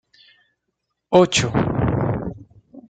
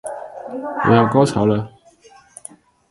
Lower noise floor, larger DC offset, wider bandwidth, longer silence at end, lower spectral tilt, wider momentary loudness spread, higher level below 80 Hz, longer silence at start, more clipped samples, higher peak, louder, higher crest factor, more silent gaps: first, -77 dBFS vs -49 dBFS; neither; second, 9.4 kHz vs 11.5 kHz; second, 0.1 s vs 1.2 s; second, -5 dB/octave vs -7 dB/octave; second, 11 LU vs 24 LU; first, -42 dBFS vs -50 dBFS; first, 1.1 s vs 0.05 s; neither; about the same, -2 dBFS vs 0 dBFS; about the same, -19 LUFS vs -17 LUFS; about the same, 20 dB vs 20 dB; neither